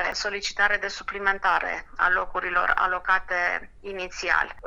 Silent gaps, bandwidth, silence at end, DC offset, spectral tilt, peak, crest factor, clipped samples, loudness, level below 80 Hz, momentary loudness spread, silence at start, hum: none; 10.5 kHz; 0 s; under 0.1%; -1.5 dB/octave; -6 dBFS; 20 dB; under 0.1%; -24 LUFS; -46 dBFS; 8 LU; 0 s; none